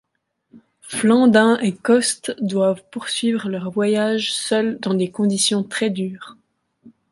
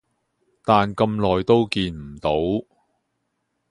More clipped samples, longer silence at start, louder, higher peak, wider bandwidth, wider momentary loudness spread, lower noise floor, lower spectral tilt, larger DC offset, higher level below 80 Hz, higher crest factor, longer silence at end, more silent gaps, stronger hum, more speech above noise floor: neither; about the same, 0.55 s vs 0.65 s; about the same, -19 LUFS vs -21 LUFS; about the same, -2 dBFS vs -2 dBFS; about the same, 11.5 kHz vs 11.5 kHz; about the same, 10 LU vs 10 LU; about the same, -71 dBFS vs -74 dBFS; second, -4 dB/octave vs -7 dB/octave; neither; second, -66 dBFS vs -46 dBFS; about the same, 18 dB vs 20 dB; second, 0.2 s vs 1.1 s; neither; neither; about the same, 52 dB vs 54 dB